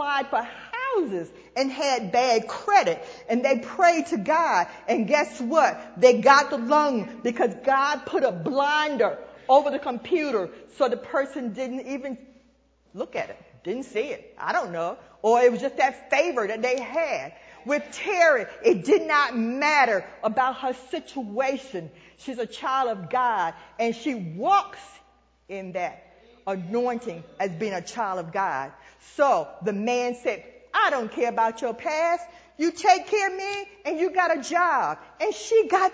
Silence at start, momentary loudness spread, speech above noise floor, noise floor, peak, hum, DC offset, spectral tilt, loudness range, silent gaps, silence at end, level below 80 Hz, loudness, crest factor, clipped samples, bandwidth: 0 s; 13 LU; 38 dB; -62 dBFS; -2 dBFS; none; under 0.1%; -4 dB/octave; 9 LU; none; 0 s; -66 dBFS; -24 LUFS; 24 dB; under 0.1%; 8 kHz